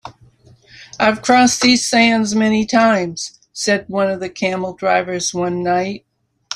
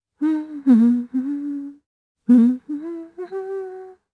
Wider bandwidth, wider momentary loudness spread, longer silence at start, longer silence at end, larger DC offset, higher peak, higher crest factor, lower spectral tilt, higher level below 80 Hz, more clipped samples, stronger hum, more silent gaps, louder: first, 14.5 kHz vs 4 kHz; second, 10 LU vs 18 LU; second, 0.05 s vs 0.2 s; second, 0 s vs 0.2 s; neither; about the same, -2 dBFS vs -4 dBFS; about the same, 16 dB vs 16 dB; second, -3.5 dB/octave vs -9 dB/octave; first, -54 dBFS vs -74 dBFS; neither; neither; second, none vs 1.86-2.15 s; first, -16 LUFS vs -20 LUFS